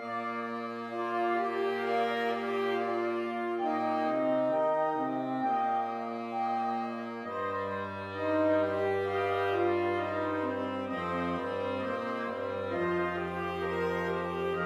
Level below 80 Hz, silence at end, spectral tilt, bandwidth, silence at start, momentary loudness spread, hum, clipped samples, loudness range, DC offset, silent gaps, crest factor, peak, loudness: -66 dBFS; 0 s; -7 dB/octave; 13.5 kHz; 0 s; 7 LU; none; under 0.1%; 3 LU; under 0.1%; none; 14 dB; -18 dBFS; -32 LUFS